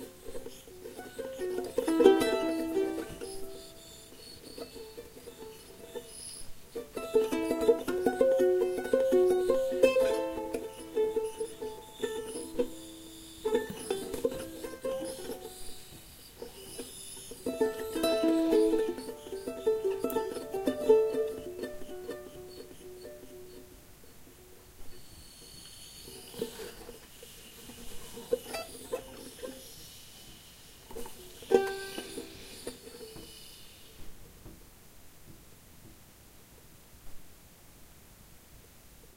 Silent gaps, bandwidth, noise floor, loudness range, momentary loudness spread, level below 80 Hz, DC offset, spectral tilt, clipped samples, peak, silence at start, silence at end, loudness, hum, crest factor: none; 16 kHz; -55 dBFS; 19 LU; 23 LU; -56 dBFS; under 0.1%; -4 dB/octave; under 0.1%; -6 dBFS; 0 s; 0.1 s; -32 LUFS; none; 28 dB